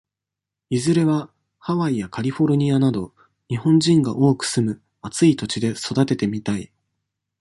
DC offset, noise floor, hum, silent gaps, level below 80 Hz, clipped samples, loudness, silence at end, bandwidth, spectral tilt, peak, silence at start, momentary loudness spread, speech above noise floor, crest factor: under 0.1%; -86 dBFS; none; none; -56 dBFS; under 0.1%; -20 LUFS; 0.75 s; 11.5 kHz; -6 dB/octave; -4 dBFS; 0.7 s; 12 LU; 67 dB; 16 dB